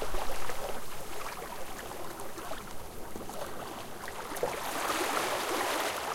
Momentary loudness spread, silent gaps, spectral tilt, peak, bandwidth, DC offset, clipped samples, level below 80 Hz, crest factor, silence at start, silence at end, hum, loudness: 11 LU; none; -2.5 dB/octave; -16 dBFS; 17 kHz; under 0.1%; under 0.1%; -48 dBFS; 18 dB; 0 s; 0 s; none; -36 LUFS